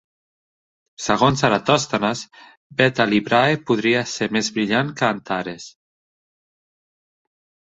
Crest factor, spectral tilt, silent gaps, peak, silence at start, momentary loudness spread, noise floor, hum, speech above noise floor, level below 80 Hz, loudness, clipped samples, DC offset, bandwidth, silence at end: 22 dB; -4.5 dB/octave; 2.57-2.70 s; 0 dBFS; 1 s; 13 LU; under -90 dBFS; none; over 70 dB; -56 dBFS; -19 LUFS; under 0.1%; under 0.1%; 8.2 kHz; 2.05 s